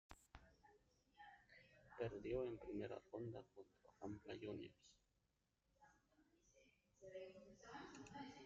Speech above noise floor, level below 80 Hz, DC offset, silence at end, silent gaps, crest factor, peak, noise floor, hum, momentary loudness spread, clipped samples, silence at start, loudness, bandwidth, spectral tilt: 35 dB; -74 dBFS; under 0.1%; 0 s; none; 22 dB; -34 dBFS; -87 dBFS; none; 19 LU; under 0.1%; 0.1 s; -53 LUFS; 7.4 kHz; -5.5 dB/octave